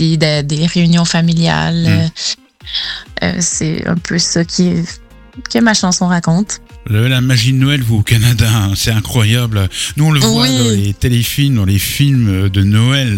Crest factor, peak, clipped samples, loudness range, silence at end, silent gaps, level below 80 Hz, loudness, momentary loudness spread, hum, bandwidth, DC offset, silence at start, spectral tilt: 12 dB; 0 dBFS; under 0.1%; 3 LU; 0 s; none; -34 dBFS; -13 LUFS; 8 LU; none; 17 kHz; under 0.1%; 0 s; -4.5 dB/octave